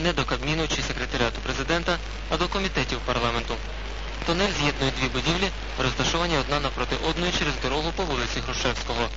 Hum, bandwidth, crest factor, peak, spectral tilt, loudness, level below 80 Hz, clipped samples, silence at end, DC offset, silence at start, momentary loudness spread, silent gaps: none; 8 kHz; 18 dB; -8 dBFS; -4 dB/octave; -26 LUFS; -34 dBFS; under 0.1%; 0 s; 0.5%; 0 s; 5 LU; none